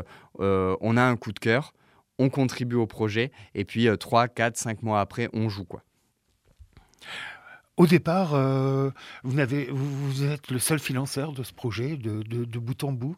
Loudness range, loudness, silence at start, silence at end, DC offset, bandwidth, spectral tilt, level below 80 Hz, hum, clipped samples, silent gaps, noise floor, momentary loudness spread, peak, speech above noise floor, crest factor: 4 LU; -26 LUFS; 0 s; 0 s; under 0.1%; 16 kHz; -6 dB/octave; -62 dBFS; none; under 0.1%; none; -70 dBFS; 14 LU; -6 dBFS; 45 dB; 20 dB